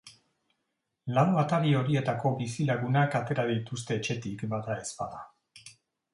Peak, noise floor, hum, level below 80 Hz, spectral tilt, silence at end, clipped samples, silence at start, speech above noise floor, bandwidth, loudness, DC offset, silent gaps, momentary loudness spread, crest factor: -10 dBFS; -82 dBFS; none; -66 dBFS; -6.5 dB/octave; 0.45 s; under 0.1%; 0.05 s; 53 dB; 11.5 kHz; -29 LUFS; under 0.1%; none; 12 LU; 20 dB